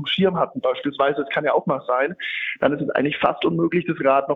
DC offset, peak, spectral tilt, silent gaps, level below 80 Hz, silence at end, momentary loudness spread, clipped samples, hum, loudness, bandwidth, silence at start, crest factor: under 0.1%; -4 dBFS; -8 dB/octave; none; -60 dBFS; 0 s; 4 LU; under 0.1%; none; -21 LUFS; 5.2 kHz; 0 s; 18 dB